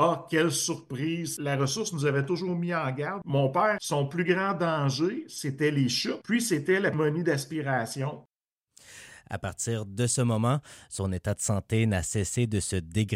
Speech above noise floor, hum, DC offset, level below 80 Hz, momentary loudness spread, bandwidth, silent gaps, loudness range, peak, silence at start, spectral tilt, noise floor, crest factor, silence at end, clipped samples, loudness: 36 dB; none; under 0.1%; -56 dBFS; 9 LU; 16 kHz; 8.52-8.56 s; 4 LU; -12 dBFS; 0 s; -5 dB/octave; -64 dBFS; 16 dB; 0 s; under 0.1%; -28 LUFS